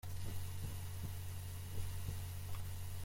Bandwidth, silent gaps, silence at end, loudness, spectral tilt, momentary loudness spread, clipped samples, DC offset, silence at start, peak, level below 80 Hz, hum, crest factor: 16.5 kHz; none; 0 s; -47 LUFS; -4.5 dB/octave; 2 LU; under 0.1%; under 0.1%; 0.05 s; -28 dBFS; -54 dBFS; none; 14 dB